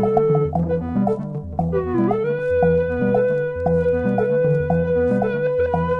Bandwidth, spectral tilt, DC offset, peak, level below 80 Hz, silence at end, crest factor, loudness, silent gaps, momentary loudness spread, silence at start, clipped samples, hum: 4.6 kHz; -10.5 dB/octave; under 0.1%; -4 dBFS; -44 dBFS; 0 s; 16 dB; -20 LUFS; none; 4 LU; 0 s; under 0.1%; none